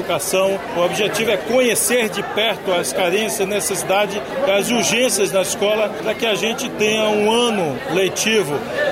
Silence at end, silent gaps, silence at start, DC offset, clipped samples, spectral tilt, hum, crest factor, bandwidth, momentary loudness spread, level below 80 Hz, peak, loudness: 0 s; none; 0 s; under 0.1%; under 0.1%; -2.5 dB/octave; none; 12 dB; 16 kHz; 5 LU; -54 dBFS; -6 dBFS; -18 LUFS